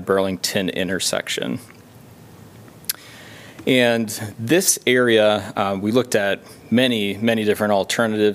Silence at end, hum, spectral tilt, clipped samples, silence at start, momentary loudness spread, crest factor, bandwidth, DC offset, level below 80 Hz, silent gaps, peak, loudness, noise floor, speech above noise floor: 0 s; none; -3.5 dB/octave; under 0.1%; 0 s; 12 LU; 18 dB; 16 kHz; under 0.1%; -62 dBFS; none; -2 dBFS; -19 LUFS; -44 dBFS; 25 dB